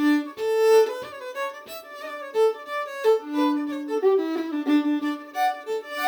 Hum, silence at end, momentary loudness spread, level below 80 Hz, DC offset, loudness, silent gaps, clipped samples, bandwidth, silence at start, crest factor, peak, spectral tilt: none; 0 s; 14 LU; -78 dBFS; under 0.1%; -24 LUFS; none; under 0.1%; over 20 kHz; 0 s; 16 dB; -8 dBFS; -3 dB/octave